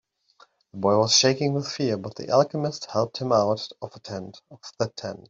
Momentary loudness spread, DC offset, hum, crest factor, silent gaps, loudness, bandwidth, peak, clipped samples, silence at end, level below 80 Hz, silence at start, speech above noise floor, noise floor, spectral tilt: 20 LU; under 0.1%; none; 20 dB; none; -23 LUFS; 8 kHz; -6 dBFS; under 0.1%; 0.1 s; -66 dBFS; 0.75 s; 34 dB; -59 dBFS; -4 dB/octave